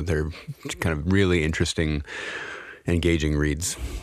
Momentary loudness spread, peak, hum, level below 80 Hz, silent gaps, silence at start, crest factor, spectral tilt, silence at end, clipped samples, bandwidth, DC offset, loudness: 12 LU; -8 dBFS; none; -34 dBFS; none; 0 s; 16 dB; -5 dB/octave; 0 s; under 0.1%; 14.5 kHz; under 0.1%; -25 LUFS